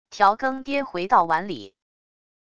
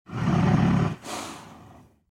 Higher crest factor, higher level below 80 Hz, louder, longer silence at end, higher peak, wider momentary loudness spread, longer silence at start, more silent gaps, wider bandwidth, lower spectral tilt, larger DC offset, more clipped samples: about the same, 20 dB vs 16 dB; second, -60 dBFS vs -44 dBFS; about the same, -22 LUFS vs -24 LUFS; first, 0.8 s vs 0.4 s; first, -4 dBFS vs -10 dBFS; second, 11 LU vs 17 LU; about the same, 0.1 s vs 0.1 s; neither; second, 8.6 kHz vs 14 kHz; second, -5 dB/octave vs -7 dB/octave; neither; neither